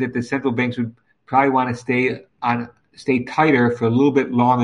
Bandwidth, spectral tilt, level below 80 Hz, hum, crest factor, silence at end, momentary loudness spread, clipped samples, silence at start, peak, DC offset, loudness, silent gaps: 10 kHz; -7.5 dB/octave; -60 dBFS; none; 18 dB; 0 s; 9 LU; under 0.1%; 0 s; -2 dBFS; under 0.1%; -19 LUFS; none